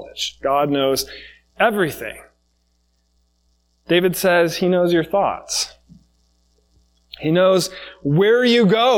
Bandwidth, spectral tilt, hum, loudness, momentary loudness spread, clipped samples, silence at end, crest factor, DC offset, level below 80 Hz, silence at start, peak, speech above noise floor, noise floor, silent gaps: 18 kHz; -4.5 dB/octave; none; -18 LUFS; 13 LU; under 0.1%; 0 s; 18 dB; under 0.1%; -54 dBFS; 0 s; -2 dBFS; 47 dB; -64 dBFS; none